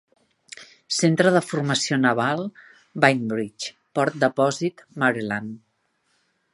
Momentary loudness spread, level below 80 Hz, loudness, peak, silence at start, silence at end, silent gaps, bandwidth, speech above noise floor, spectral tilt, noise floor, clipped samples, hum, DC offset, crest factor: 19 LU; -68 dBFS; -22 LUFS; 0 dBFS; 0.6 s; 0.95 s; none; 11.5 kHz; 48 dB; -4.5 dB/octave; -70 dBFS; under 0.1%; none; under 0.1%; 24 dB